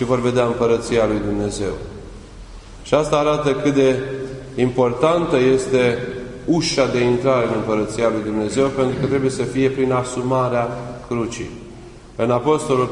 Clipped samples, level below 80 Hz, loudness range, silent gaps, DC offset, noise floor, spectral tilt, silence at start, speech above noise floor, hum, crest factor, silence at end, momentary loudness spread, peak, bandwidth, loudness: under 0.1%; -42 dBFS; 3 LU; none; under 0.1%; -39 dBFS; -6 dB/octave; 0 s; 20 dB; none; 16 dB; 0 s; 13 LU; -2 dBFS; 11 kHz; -19 LUFS